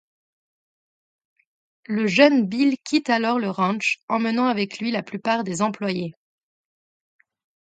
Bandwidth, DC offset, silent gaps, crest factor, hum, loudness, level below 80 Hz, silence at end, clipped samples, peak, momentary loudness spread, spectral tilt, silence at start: 9.2 kHz; under 0.1%; 4.03-4.08 s; 24 dB; none; -22 LUFS; -72 dBFS; 1.55 s; under 0.1%; 0 dBFS; 10 LU; -5 dB/octave; 1.9 s